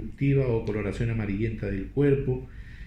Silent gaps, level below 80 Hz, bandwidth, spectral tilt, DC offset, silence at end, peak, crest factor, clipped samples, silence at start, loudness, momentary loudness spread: none; -40 dBFS; 8.8 kHz; -9.5 dB/octave; under 0.1%; 0 s; -12 dBFS; 16 dB; under 0.1%; 0 s; -27 LUFS; 8 LU